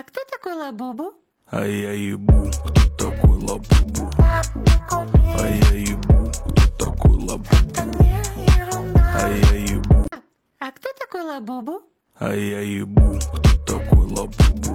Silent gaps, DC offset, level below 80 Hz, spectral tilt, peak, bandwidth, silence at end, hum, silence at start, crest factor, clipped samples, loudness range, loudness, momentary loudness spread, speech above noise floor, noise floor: none; under 0.1%; -20 dBFS; -6 dB/octave; -4 dBFS; 15.5 kHz; 0 s; none; 0.15 s; 14 dB; under 0.1%; 5 LU; -19 LUFS; 13 LU; 24 dB; -41 dBFS